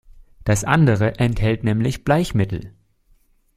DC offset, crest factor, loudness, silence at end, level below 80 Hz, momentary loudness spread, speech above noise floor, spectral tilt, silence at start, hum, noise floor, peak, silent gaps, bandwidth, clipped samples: under 0.1%; 18 dB; -19 LUFS; 0.9 s; -38 dBFS; 8 LU; 40 dB; -6.5 dB/octave; 0.45 s; none; -58 dBFS; -2 dBFS; none; 14 kHz; under 0.1%